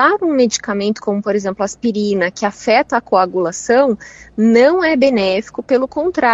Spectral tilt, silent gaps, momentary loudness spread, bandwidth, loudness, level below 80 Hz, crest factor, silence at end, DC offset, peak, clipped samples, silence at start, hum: -4.5 dB/octave; none; 7 LU; 8 kHz; -15 LUFS; -52 dBFS; 14 dB; 0 s; under 0.1%; 0 dBFS; under 0.1%; 0 s; none